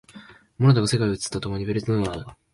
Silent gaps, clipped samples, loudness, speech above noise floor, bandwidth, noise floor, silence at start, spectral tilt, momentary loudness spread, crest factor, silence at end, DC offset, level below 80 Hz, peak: none; under 0.1%; -23 LUFS; 25 dB; 11.5 kHz; -47 dBFS; 0.15 s; -6 dB/octave; 10 LU; 16 dB; 0.2 s; under 0.1%; -48 dBFS; -6 dBFS